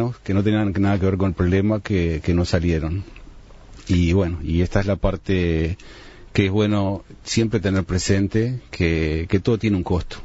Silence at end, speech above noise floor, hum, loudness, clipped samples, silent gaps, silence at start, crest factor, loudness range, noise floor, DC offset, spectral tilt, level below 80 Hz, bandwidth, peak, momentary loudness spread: 0 s; 22 dB; none; -21 LUFS; under 0.1%; none; 0 s; 18 dB; 1 LU; -42 dBFS; under 0.1%; -6.5 dB/octave; -34 dBFS; 8 kHz; -4 dBFS; 6 LU